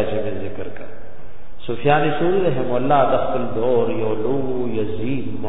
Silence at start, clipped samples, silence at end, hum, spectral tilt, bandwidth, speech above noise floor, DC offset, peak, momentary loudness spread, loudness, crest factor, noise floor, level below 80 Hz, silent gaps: 0 s; under 0.1%; 0 s; none; -10.5 dB/octave; 4 kHz; 21 dB; 10%; -2 dBFS; 14 LU; -21 LUFS; 18 dB; -41 dBFS; -44 dBFS; none